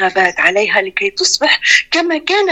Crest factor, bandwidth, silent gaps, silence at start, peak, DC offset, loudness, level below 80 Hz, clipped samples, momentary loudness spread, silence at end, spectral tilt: 14 dB; 15.5 kHz; none; 0 s; 0 dBFS; under 0.1%; -12 LUFS; -54 dBFS; under 0.1%; 5 LU; 0 s; -1 dB/octave